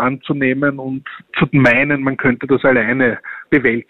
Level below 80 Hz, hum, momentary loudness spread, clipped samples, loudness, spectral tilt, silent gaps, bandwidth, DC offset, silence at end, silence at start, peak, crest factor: -48 dBFS; none; 13 LU; under 0.1%; -15 LUFS; -8.5 dB/octave; none; 6.6 kHz; under 0.1%; 0.05 s; 0 s; -2 dBFS; 14 dB